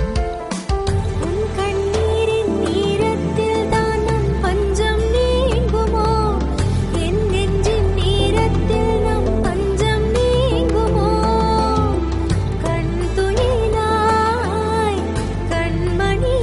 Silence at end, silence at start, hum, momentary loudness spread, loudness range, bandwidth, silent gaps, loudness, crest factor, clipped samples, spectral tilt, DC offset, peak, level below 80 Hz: 0 s; 0 s; none; 4 LU; 1 LU; 11.5 kHz; none; -18 LUFS; 14 dB; under 0.1%; -6.5 dB/octave; under 0.1%; -4 dBFS; -24 dBFS